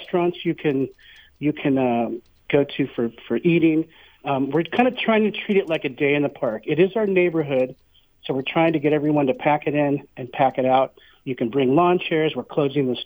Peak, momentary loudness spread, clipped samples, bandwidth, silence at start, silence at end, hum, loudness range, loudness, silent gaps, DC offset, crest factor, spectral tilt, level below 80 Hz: -4 dBFS; 9 LU; under 0.1%; over 20 kHz; 0 s; 0 s; none; 2 LU; -21 LUFS; none; under 0.1%; 18 dB; -9 dB/octave; -60 dBFS